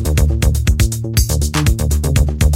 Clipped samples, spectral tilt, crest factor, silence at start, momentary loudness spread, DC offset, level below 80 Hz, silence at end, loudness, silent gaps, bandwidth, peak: under 0.1%; -5 dB/octave; 14 dB; 0 s; 2 LU; under 0.1%; -16 dBFS; 0 s; -16 LUFS; none; 16.5 kHz; 0 dBFS